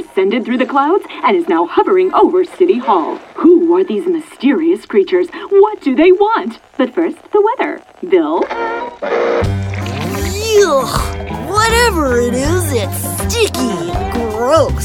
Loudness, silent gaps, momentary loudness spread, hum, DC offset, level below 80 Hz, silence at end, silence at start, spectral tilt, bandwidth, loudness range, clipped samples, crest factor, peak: -14 LUFS; none; 9 LU; none; under 0.1%; -30 dBFS; 0 s; 0 s; -5 dB/octave; 17 kHz; 4 LU; under 0.1%; 12 dB; 0 dBFS